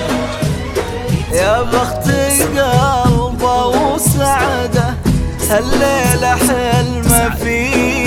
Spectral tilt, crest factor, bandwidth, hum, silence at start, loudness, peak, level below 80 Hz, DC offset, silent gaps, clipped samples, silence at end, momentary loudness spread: -4.5 dB/octave; 14 dB; 17.5 kHz; none; 0 s; -14 LUFS; 0 dBFS; -24 dBFS; under 0.1%; none; under 0.1%; 0 s; 6 LU